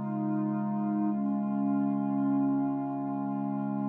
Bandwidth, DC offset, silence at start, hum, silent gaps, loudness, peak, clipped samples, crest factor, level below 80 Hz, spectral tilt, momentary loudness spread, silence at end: 2.9 kHz; under 0.1%; 0 s; none; none; -30 LUFS; -20 dBFS; under 0.1%; 10 dB; under -90 dBFS; -12.5 dB/octave; 5 LU; 0 s